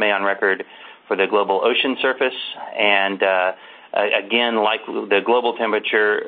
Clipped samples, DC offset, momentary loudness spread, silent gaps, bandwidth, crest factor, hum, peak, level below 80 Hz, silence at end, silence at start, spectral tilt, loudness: under 0.1%; under 0.1%; 9 LU; none; 4.6 kHz; 20 dB; none; 0 dBFS; -70 dBFS; 0 s; 0 s; -8 dB/octave; -19 LUFS